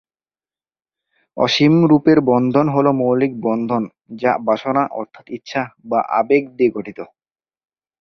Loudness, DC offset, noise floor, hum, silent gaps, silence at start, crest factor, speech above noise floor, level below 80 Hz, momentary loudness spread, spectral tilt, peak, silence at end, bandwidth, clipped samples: -17 LUFS; under 0.1%; under -90 dBFS; none; none; 1.35 s; 16 dB; over 73 dB; -58 dBFS; 17 LU; -7 dB/octave; -2 dBFS; 0.95 s; 6.8 kHz; under 0.1%